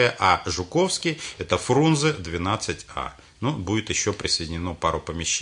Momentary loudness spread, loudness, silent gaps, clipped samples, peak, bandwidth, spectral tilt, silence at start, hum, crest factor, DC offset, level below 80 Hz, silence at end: 10 LU; -24 LUFS; none; under 0.1%; -4 dBFS; 11 kHz; -4 dB/octave; 0 s; none; 20 dB; under 0.1%; -48 dBFS; 0 s